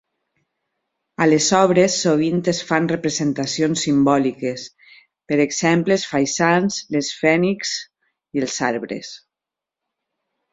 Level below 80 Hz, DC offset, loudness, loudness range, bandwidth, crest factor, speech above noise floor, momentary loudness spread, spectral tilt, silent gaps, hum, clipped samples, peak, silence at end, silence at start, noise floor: -60 dBFS; under 0.1%; -19 LUFS; 5 LU; 8 kHz; 18 dB; 68 dB; 12 LU; -4.5 dB/octave; none; none; under 0.1%; -2 dBFS; 1.35 s; 1.2 s; -87 dBFS